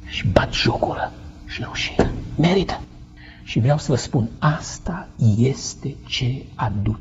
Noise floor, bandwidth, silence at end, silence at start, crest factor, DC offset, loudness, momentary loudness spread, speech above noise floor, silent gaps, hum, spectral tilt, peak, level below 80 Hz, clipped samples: -41 dBFS; 8 kHz; 0 s; 0 s; 22 dB; under 0.1%; -22 LUFS; 12 LU; 20 dB; none; none; -5.5 dB/octave; 0 dBFS; -36 dBFS; under 0.1%